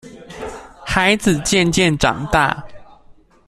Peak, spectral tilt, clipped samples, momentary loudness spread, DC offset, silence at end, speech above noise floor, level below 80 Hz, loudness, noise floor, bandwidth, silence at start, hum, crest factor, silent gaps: -2 dBFS; -4 dB/octave; under 0.1%; 18 LU; under 0.1%; 0.35 s; 31 dB; -36 dBFS; -16 LUFS; -47 dBFS; 14 kHz; 0.05 s; none; 18 dB; none